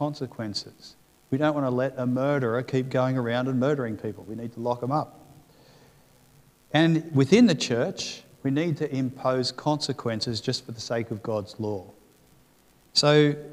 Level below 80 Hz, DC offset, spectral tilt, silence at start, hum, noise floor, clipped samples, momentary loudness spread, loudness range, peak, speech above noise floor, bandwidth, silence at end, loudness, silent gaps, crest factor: -66 dBFS; under 0.1%; -5.5 dB/octave; 0 s; none; -60 dBFS; under 0.1%; 13 LU; 6 LU; -6 dBFS; 34 dB; 15 kHz; 0 s; -26 LUFS; none; 22 dB